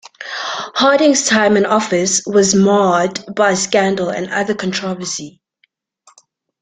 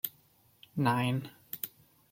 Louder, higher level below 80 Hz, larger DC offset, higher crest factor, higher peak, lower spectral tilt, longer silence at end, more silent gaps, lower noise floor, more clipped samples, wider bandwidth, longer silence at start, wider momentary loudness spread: first, -15 LUFS vs -34 LUFS; first, -56 dBFS vs -74 dBFS; neither; second, 14 dB vs 22 dB; first, 0 dBFS vs -12 dBFS; second, -3.5 dB/octave vs -6 dB/octave; first, 1.35 s vs 0.45 s; neither; second, -62 dBFS vs -66 dBFS; neither; second, 9.6 kHz vs 16.5 kHz; first, 0.2 s vs 0.05 s; about the same, 11 LU vs 13 LU